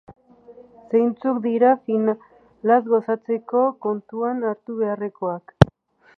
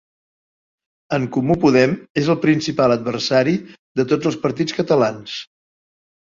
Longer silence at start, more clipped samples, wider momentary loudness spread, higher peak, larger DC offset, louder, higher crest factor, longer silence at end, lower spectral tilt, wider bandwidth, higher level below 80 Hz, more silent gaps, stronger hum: second, 0.1 s vs 1.1 s; neither; about the same, 9 LU vs 9 LU; about the same, 0 dBFS vs -2 dBFS; neither; second, -22 LUFS vs -18 LUFS; about the same, 22 dB vs 18 dB; second, 0.5 s vs 0.85 s; first, -8.5 dB/octave vs -6 dB/octave; second, 6.8 kHz vs 7.6 kHz; first, -46 dBFS vs -54 dBFS; second, none vs 2.10-2.15 s, 3.79-3.95 s; neither